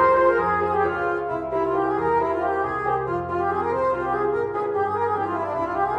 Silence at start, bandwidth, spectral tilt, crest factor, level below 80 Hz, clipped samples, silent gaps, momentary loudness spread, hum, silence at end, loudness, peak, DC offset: 0 s; 9.4 kHz; -8 dB/octave; 16 dB; -50 dBFS; under 0.1%; none; 5 LU; none; 0 s; -23 LUFS; -8 dBFS; under 0.1%